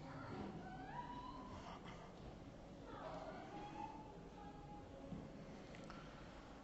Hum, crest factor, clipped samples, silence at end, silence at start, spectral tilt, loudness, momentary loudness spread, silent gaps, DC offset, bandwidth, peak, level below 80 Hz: none; 16 dB; under 0.1%; 0 s; 0 s; -5 dB/octave; -54 LUFS; 6 LU; none; under 0.1%; 8 kHz; -36 dBFS; -64 dBFS